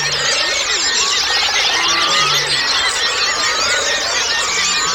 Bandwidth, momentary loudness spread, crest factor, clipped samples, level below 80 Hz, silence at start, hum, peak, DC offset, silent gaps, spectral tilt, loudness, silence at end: 19.5 kHz; 2 LU; 14 dB; under 0.1%; -46 dBFS; 0 s; none; -2 dBFS; under 0.1%; none; 0.5 dB/octave; -13 LUFS; 0 s